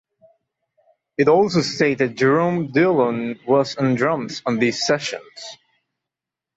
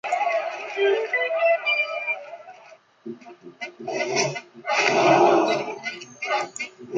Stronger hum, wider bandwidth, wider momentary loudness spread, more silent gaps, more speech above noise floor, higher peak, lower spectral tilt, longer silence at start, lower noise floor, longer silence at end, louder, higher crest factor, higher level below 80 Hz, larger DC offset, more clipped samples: neither; second, 8 kHz vs 9.2 kHz; second, 13 LU vs 22 LU; neither; first, 68 dB vs 28 dB; about the same, -4 dBFS vs -4 dBFS; first, -5.5 dB/octave vs -3.5 dB/octave; first, 1.2 s vs 0.05 s; first, -87 dBFS vs -50 dBFS; first, 1.05 s vs 0 s; first, -19 LUFS vs -23 LUFS; about the same, 16 dB vs 20 dB; first, -62 dBFS vs -76 dBFS; neither; neither